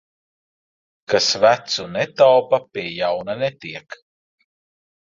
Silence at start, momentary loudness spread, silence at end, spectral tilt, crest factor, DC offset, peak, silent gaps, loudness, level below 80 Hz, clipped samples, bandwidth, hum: 1.1 s; 14 LU; 1.1 s; -3 dB/octave; 20 dB; under 0.1%; -2 dBFS; none; -18 LUFS; -62 dBFS; under 0.1%; 7.6 kHz; none